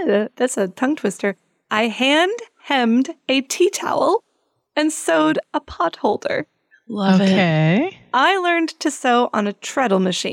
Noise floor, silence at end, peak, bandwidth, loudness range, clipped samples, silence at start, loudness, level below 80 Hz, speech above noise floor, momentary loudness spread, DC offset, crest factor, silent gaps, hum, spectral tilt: -68 dBFS; 0 s; -4 dBFS; 16 kHz; 2 LU; under 0.1%; 0 s; -19 LUFS; -58 dBFS; 50 dB; 8 LU; under 0.1%; 14 dB; none; none; -4.5 dB/octave